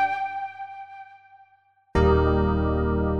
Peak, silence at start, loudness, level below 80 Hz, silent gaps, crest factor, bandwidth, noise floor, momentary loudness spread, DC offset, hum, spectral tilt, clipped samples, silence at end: -6 dBFS; 0 s; -24 LUFS; -32 dBFS; none; 18 dB; 6.6 kHz; -62 dBFS; 20 LU; under 0.1%; 50 Hz at -60 dBFS; -9 dB/octave; under 0.1%; 0 s